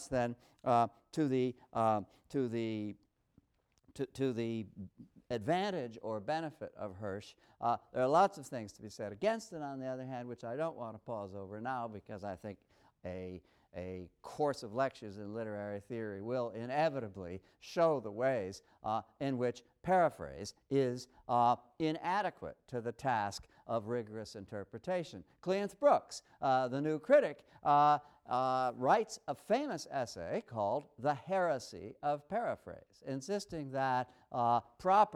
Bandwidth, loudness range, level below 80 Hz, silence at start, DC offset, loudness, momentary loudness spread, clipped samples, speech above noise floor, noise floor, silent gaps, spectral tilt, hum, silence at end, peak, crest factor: 13.5 kHz; 9 LU; -70 dBFS; 0 s; under 0.1%; -36 LUFS; 15 LU; under 0.1%; 38 dB; -74 dBFS; none; -6 dB/octave; none; 0 s; -16 dBFS; 20 dB